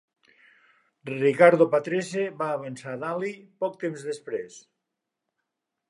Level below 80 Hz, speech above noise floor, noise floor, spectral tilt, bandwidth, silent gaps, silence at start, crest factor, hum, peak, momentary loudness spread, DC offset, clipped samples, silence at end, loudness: -80 dBFS; 59 dB; -84 dBFS; -6 dB/octave; 11 kHz; none; 1.05 s; 24 dB; none; -2 dBFS; 17 LU; under 0.1%; under 0.1%; 1.3 s; -25 LUFS